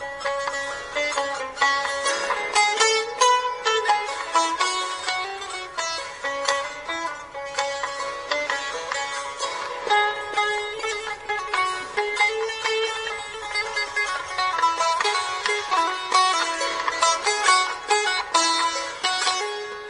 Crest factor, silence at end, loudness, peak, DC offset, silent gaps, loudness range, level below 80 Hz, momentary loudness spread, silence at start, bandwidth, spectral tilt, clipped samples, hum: 20 dB; 0 s; -23 LUFS; -4 dBFS; under 0.1%; none; 6 LU; -58 dBFS; 9 LU; 0 s; 10.5 kHz; 0.5 dB/octave; under 0.1%; none